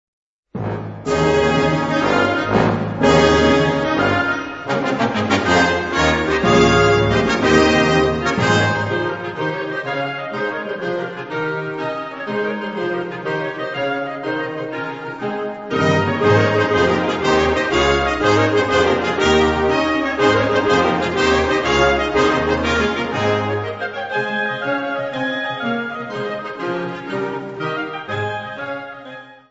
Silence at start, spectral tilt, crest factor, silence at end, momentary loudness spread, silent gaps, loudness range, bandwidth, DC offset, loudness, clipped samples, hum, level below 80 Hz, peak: 0.55 s; -5.5 dB/octave; 18 dB; 0.15 s; 11 LU; none; 8 LU; 8 kHz; under 0.1%; -18 LUFS; under 0.1%; none; -38 dBFS; 0 dBFS